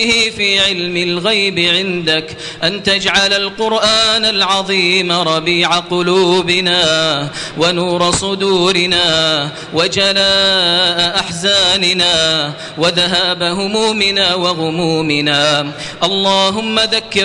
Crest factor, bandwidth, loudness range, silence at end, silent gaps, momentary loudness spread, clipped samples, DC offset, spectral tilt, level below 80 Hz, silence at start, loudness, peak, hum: 14 dB; 11 kHz; 2 LU; 0 s; none; 6 LU; under 0.1%; under 0.1%; -3 dB/octave; -46 dBFS; 0 s; -12 LUFS; 0 dBFS; none